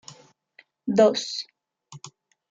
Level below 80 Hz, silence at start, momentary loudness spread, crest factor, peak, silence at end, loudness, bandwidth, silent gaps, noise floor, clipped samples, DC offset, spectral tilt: -74 dBFS; 0.1 s; 25 LU; 20 dB; -6 dBFS; 0.45 s; -23 LUFS; 8 kHz; none; -59 dBFS; under 0.1%; under 0.1%; -4.5 dB/octave